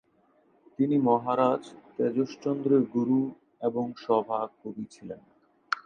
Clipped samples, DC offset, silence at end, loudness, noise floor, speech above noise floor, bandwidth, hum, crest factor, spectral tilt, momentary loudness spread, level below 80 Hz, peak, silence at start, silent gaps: under 0.1%; under 0.1%; 0.05 s; -28 LUFS; -65 dBFS; 38 dB; 9 kHz; none; 18 dB; -7.5 dB/octave; 16 LU; -74 dBFS; -10 dBFS; 0.8 s; none